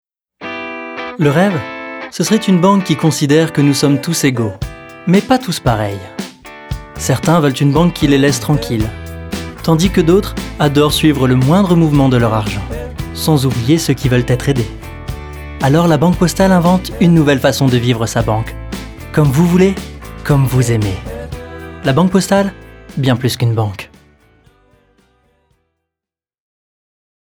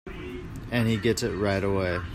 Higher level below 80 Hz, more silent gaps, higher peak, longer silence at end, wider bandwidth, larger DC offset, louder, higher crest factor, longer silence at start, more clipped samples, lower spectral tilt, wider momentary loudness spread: first, -32 dBFS vs -44 dBFS; neither; first, 0 dBFS vs -12 dBFS; first, 3.45 s vs 0 s; first, over 20 kHz vs 15.5 kHz; neither; first, -13 LUFS vs -26 LUFS; about the same, 14 dB vs 16 dB; first, 0.4 s vs 0.05 s; neither; about the same, -6 dB/octave vs -5.5 dB/octave; first, 16 LU vs 13 LU